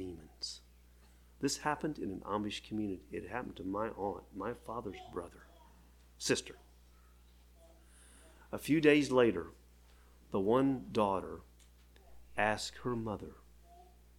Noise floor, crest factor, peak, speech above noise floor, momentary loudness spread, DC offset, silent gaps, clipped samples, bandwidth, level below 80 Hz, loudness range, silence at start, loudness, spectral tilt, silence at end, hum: -61 dBFS; 24 dB; -14 dBFS; 27 dB; 16 LU; under 0.1%; none; under 0.1%; 17.5 kHz; -60 dBFS; 10 LU; 0 s; -36 LUFS; -4.5 dB/octave; 0.35 s; 60 Hz at -60 dBFS